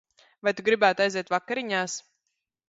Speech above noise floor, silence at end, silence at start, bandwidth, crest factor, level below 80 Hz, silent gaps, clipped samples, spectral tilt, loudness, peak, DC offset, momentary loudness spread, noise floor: 55 dB; 0.7 s; 0.45 s; 8 kHz; 22 dB; -74 dBFS; none; under 0.1%; -3 dB/octave; -26 LUFS; -6 dBFS; under 0.1%; 9 LU; -81 dBFS